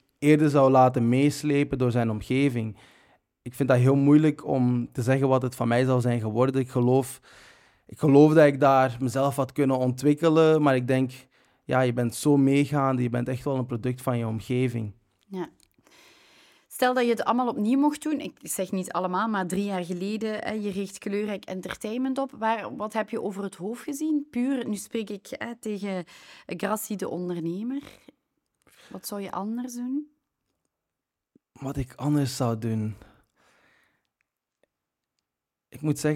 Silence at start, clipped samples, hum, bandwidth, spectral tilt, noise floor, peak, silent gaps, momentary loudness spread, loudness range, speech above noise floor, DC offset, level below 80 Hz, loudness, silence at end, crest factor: 0.2 s; under 0.1%; none; 16.5 kHz; -7 dB/octave; -87 dBFS; -6 dBFS; none; 15 LU; 12 LU; 62 dB; under 0.1%; -58 dBFS; -25 LUFS; 0 s; 20 dB